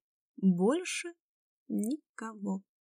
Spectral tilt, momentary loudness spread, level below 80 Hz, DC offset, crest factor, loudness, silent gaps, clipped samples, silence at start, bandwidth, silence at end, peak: -6 dB/octave; 12 LU; under -90 dBFS; under 0.1%; 16 dB; -33 LUFS; 1.20-1.66 s, 2.09-2.15 s; under 0.1%; 0.4 s; 15.5 kHz; 0.2 s; -18 dBFS